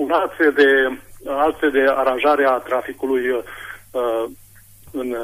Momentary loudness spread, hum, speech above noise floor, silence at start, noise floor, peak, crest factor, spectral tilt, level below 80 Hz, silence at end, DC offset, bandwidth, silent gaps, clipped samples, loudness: 15 LU; none; 27 dB; 0 s; -45 dBFS; -4 dBFS; 14 dB; -4 dB/octave; -52 dBFS; 0 s; under 0.1%; 15.5 kHz; none; under 0.1%; -18 LUFS